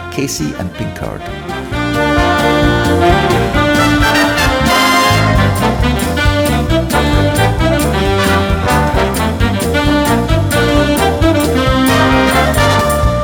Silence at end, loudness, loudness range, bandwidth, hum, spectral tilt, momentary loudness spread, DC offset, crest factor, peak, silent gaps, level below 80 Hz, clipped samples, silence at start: 0 s; -12 LUFS; 2 LU; 19.5 kHz; none; -5 dB/octave; 8 LU; under 0.1%; 12 dB; 0 dBFS; none; -22 dBFS; under 0.1%; 0 s